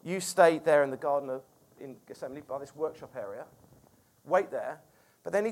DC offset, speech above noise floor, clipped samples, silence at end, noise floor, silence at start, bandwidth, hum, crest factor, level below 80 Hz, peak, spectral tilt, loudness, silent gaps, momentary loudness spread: under 0.1%; 33 dB; under 0.1%; 0 s; -63 dBFS; 0.05 s; 16 kHz; none; 22 dB; -78 dBFS; -8 dBFS; -4.5 dB/octave; -29 LUFS; none; 24 LU